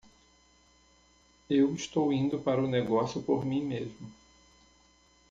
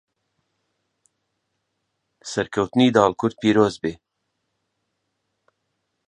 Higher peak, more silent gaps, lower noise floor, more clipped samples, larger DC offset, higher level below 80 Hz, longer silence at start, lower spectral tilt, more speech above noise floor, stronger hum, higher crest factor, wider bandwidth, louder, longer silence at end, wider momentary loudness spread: second, -14 dBFS vs -2 dBFS; neither; second, -64 dBFS vs -76 dBFS; neither; neither; second, -64 dBFS vs -58 dBFS; second, 1.5 s vs 2.25 s; about the same, -6.5 dB/octave vs -5.5 dB/octave; second, 35 dB vs 57 dB; neither; second, 18 dB vs 24 dB; second, 7.8 kHz vs 10 kHz; second, -30 LUFS vs -20 LUFS; second, 1.15 s vs 2.15 s; about the same, 11 LU vs 13 LU